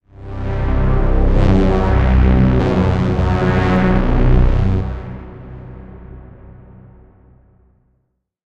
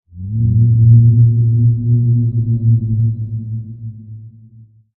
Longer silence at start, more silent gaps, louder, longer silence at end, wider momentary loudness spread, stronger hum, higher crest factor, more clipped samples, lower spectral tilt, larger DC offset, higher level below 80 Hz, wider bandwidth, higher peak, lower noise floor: about the same, 0.2 s vs 0.15 s; neither; second, -16 LUFS vs -13 LUFS; first, 1.95 s vs 0.7 s; first, 21 LU vs 18 LU; neither; about the same, 14 dB vs 14 dB; neither; second, -9 dB/octave vs -17 dB/octave; neither; first, -18 dBFS vs -38 dBFS; first, 6.6 kHz vs 0.6 kHz; about the same, -2 dBFS vs 0 dBFS; first, -67 dBFS vs -43 dBFS